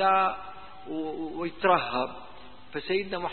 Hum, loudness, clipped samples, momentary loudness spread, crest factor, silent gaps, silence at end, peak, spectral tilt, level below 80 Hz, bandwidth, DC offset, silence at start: none; -29 LUFS; under 0.1%; 21 LU; 20 dB; none; 0 s; -8 dBFS; -9 dB/octave; -58 dBFS; 4.4 kHz; 0.6%; 0 s